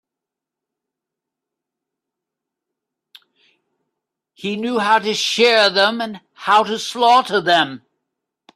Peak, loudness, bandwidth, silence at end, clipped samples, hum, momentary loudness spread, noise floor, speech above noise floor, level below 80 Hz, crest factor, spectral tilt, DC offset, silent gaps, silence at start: -2 dBFS; -16 LUFS; 14 kHz; 0.8 s; under 0.1%; none; 13 LU; -85 dBFS; 69 dB; -70 dBFS; 20 dB; -2.5 dB/octave; under 0.1%; none; 4.4 s